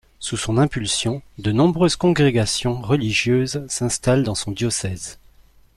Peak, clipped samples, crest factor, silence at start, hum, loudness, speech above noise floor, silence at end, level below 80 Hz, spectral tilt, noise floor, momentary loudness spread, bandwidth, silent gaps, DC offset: -6 dBFS; under 0.1%; 16 dB; 0.2 s; none; -20 LUFS; 31 dB; 0.6 s; -44 dBFS; -5 dB/octave; -51 dBFS; 9 LU; 13 kHz; none; under 0.1%